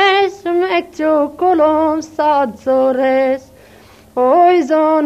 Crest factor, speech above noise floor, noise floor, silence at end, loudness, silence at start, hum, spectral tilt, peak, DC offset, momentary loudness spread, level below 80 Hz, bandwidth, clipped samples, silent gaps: 14 dB; 30 dB; -43 dBFS; 0 s; -14 LUFS; 0 s; none; -4.5 dB/octave; 0 dBFS; under 0.1%; 7 LU; -54 dBFS; 14 kHz; under 0.1%; none